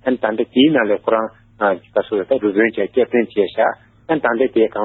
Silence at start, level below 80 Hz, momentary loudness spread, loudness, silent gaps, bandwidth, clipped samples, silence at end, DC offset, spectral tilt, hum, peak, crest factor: 0.05 s; -58 dBFS; 6 LU; -17 LUFS; none; 4.2 kHz; under 0.1%; 0 s; under 0.1%; -9 dB/octave; none; -2 dBFS; 14 dB